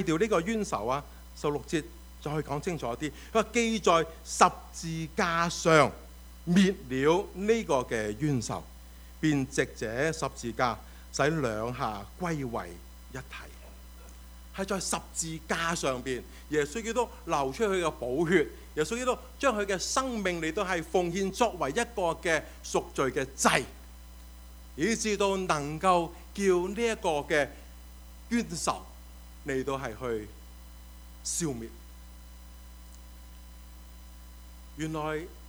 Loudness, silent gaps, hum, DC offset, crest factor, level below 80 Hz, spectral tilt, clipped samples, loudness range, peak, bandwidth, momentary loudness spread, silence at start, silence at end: -30 LUFS; none; none; under 0.1%; 26 dB; -48 dBFS; -4.5 dB/octave; under 0.1%; 10 LU; -4 dBFS; over 20 kHz; 24 LU; 0 s; 0 s